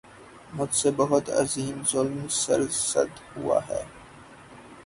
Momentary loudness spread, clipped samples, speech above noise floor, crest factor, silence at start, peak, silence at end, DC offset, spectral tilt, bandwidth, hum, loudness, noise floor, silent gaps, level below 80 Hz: 11 LU; under 0.1%; 22 dB; 20 dB; 0.05 s; -8 dBFS; 0.05 s; under 0.1%; -3.5 dB/octave; 11.5 kHz; none; -26 LUFS; -48 dBFS; none; -58 dBFS